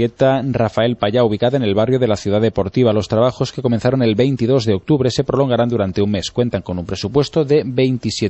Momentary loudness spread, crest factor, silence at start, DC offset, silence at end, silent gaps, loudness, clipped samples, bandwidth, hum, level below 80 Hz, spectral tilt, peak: 4 LU; 14 dB; 0 s; under 0.1%; 0 s; none; -17 LUFS; under 0.1%; 8.4 kHz; none; -44 dBFS; -6.5 dB/octave; -2 dBFS